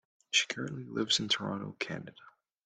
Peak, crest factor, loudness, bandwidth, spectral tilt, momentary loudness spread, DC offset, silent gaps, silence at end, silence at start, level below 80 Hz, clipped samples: -14 dBFS; 22 dB; -32 LUFS; 10 kHz; -2.5 dB/octave; 10 LU; under 0.1%; none; 0.35 s; 0.3 s; -74 dBFS; under 0.1%